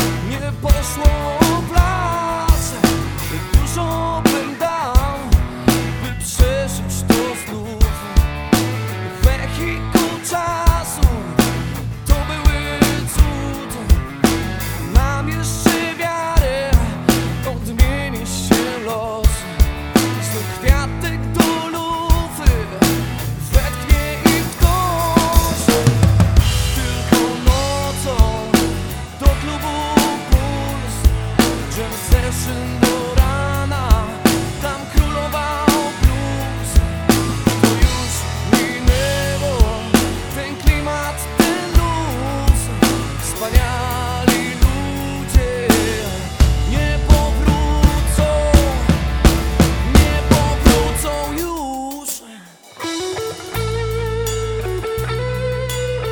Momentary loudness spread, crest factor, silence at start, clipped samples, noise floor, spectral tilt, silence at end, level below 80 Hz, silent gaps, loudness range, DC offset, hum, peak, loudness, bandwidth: 8 LU; 16 dB; 0 s; under 0.1%; -40 dBFS; -5 dB/octave; 0 s; -20 dBFS; none; 3 LU; under 0.1%; none; 0 dBFS; -18 LUFS; over 20 kHz